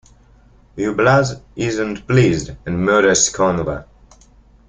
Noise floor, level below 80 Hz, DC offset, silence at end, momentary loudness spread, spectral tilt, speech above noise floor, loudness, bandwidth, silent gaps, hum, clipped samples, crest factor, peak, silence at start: -49 dBFS; -42 dBFS; under 0.1%; 0.85 s; 11 LU; -4.5 dB/octave; 32 dB; -17 LUFS; 9.6 kHz; none; none; under 0.1%; 16 dB; -2 dBFS; 0.75 s